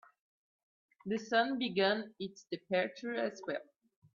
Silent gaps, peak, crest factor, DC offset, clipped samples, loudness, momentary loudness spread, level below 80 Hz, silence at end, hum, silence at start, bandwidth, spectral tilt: none; -18 dBFS; 20 dB; under 0.1%; under 0.1%; -35 LUFS; 13 LU; -82 dBFS; 0.55 s; none; 1.05 s; 7.4 kHz; -5 dB/octave